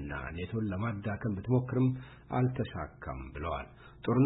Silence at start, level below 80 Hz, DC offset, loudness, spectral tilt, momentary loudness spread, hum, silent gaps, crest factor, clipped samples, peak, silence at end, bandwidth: 0 s; -50 dBFS; under 0.1%; -34 LUFS; -11.5 dB/octave; 11 LU; none; none; 18 dB; under 0.1%; -16 dBFS; 0 s; 4 kHz